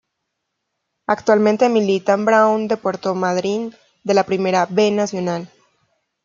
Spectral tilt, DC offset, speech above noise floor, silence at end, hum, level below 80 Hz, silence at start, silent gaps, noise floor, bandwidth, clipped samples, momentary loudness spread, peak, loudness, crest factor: -5.5 dB/octave; under 0.1%; 59 dB; 0.8 s; none; -66 dBFS; 1.1 s; none; -76 dBFS; 7.6 kHz; under 0.1%; 10 LU; -2 dBFS; -18 LUFS; 16 dB